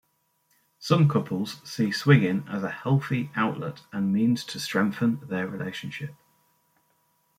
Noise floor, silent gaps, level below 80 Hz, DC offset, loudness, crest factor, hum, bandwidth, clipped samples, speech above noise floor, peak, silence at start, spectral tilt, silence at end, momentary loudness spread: -70 dBFS; none; -66 dBFS; under 0.1%; -26 LUFS; 22 dB; none; 15.5 kHz; under 0.1%; 45 dB; -6 dBFS; 0.8 s; -6.5 dB/octave; 1.25 s; 14 LU